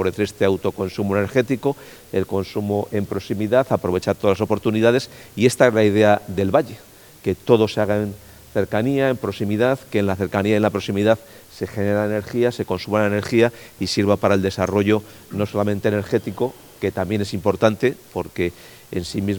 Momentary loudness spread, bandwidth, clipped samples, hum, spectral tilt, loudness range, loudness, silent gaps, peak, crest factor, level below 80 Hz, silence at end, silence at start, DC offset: 9 LU; 19 kHz; under 0.1%; none; -6.5 dB/octave; 4 LU; -21 LUFS; none; 0 dBFS; 20 dB; -52 dBFS; 0 s; 0 s; under 0.1%